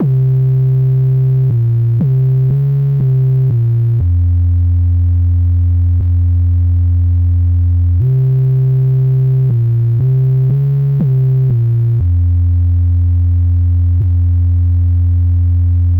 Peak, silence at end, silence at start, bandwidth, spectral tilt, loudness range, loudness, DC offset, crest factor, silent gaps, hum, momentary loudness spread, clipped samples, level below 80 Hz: -8 dBFS; 0 s; 0 s; 1.6 kHz; -12.5 dB/octave; 0 LU; -12 LUFS; under 0.1%; 4 dB; none; none; 1 LU; under 0.1%; -22 dBFS